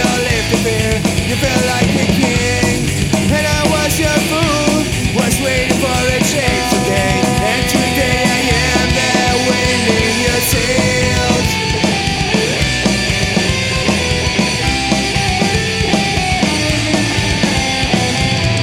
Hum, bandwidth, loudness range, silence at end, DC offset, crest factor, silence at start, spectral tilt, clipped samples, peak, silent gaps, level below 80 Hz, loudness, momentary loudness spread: none; 16.5 kHz; 1 LU; 0 s; under 0.1%; 14 dB; 0 s; -4 dB/octave; under 0.1%; 0 dBFS; none; -26 dBFS; -13 LUFS; 2 LU